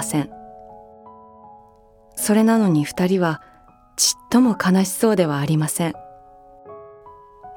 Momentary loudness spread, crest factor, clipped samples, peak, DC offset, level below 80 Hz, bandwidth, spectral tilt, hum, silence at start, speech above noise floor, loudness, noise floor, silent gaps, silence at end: 20 LU; 18 dB; under 0.1%; -2 dBFS; under 0.1%; -58 dBFS; 18 kHz; -5 dB/octave; none; 0 s; 33 dB; -19 LUFS; -51 dBFS; none; 0 s